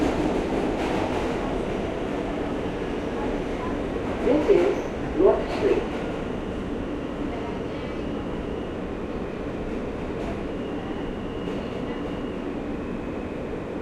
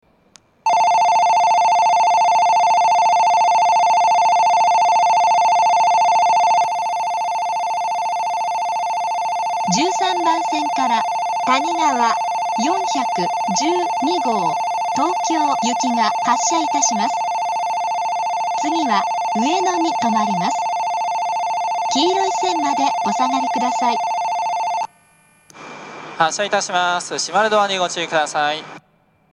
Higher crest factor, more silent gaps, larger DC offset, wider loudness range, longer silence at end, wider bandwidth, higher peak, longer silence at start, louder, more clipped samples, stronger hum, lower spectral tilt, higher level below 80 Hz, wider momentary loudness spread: about the same, 20 dB vs 18 dB; neither; neither; about the same, 7 LU vs 6 LU; second, 0 s vs 0.55 s; about the same, 12 kHz vs 11.5 kHz; second, -6 dBFS vs 0 dBFS; second, 0 s vs 0.65 s; second, -27 LUFS vs -17 LUFS; neither; neither; first, -7 dB/octave vs -2.5 dB/octave; first, -40 dBFS vs -70 dBFS; first, 10 LU vs 6 LU